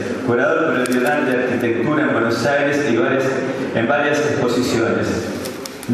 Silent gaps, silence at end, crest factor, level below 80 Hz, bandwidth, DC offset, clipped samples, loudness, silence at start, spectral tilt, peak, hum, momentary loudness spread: none; 0 s; 16 dB; -54 dBFS; 13.5 kHz; under 0.1%; under 0.1%; -18 LUFS; 0 s; -5.5 dB/octave; -2 dBFS; none; 5 LU